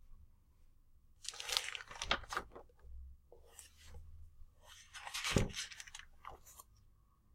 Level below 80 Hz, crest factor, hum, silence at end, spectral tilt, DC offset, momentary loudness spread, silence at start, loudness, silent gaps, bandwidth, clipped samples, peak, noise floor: -54 dBFS; 36 dB; none; 0.45 s; -3 dB/octave; under 0.1%; 22 LU; 0 s; -41 LUFS; none; 16 kHz; under 0.1%; -10 dBFS; -68 dBFS